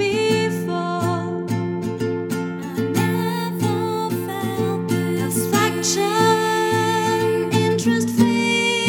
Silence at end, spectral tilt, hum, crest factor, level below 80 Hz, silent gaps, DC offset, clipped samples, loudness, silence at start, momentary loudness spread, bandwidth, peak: 0 s; -4.5 dB/octave; none; 16 dB; -60 dBFS; none; under 0.1%; under 0.1%; -20 LUFS; 0 s; 7 LU; 18 kHz; -4 dBFS